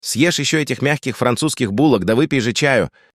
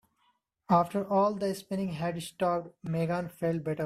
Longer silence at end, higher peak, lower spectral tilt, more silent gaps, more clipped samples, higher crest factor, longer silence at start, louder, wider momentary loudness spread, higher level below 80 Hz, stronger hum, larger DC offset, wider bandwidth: first, 0.25 s vs 0 s; first, -2 dBFS vs -12 dBFS; second, -4.5 dB/octave vs -7 dB/octave; neither; neither; about the same, 16 dB vs 20 dB; second, 0.05 s vs 0.7 s; first, -17 LUFS vs -30 LUFS; second, 4 LU vs 8 LU; first, -50 dBFS vs -66 dBFS; neither; neither; about the same, 14.5 kHz vs 15 kHz